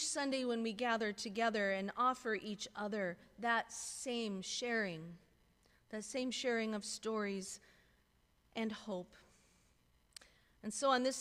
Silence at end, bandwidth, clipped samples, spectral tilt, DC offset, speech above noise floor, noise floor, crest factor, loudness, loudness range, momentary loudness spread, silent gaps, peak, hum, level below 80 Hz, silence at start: 0 s; 15.5 kHz; under 0.1%; -3 dB/octave; under 0.1%; 35 dB; -74 dBFS; 20 dB; -39 LUFS; 8 LU; 14 LU; none; -20 dBFS; none; -76 dBFS; 0 s